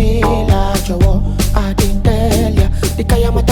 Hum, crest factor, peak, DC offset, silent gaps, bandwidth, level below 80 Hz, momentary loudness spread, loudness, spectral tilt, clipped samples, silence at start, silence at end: none; 12 dB; 0 dBFS; under 0.1%; none; 18.5 kHz; -16 dBFS; 3 LU; -14 LUFS; -6 dB/octave; under 0.1%; 0 s; 0 s